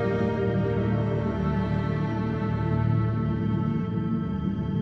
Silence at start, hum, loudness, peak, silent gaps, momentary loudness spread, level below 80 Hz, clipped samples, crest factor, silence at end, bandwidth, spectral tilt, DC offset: 0 s; none; -26 LUFS; -14 dBFS; none; 3 LU; -40 dBFS; under 0.1%; 12 dB; 0 s; 6 kHz; -10 dB/octave; under 0.1%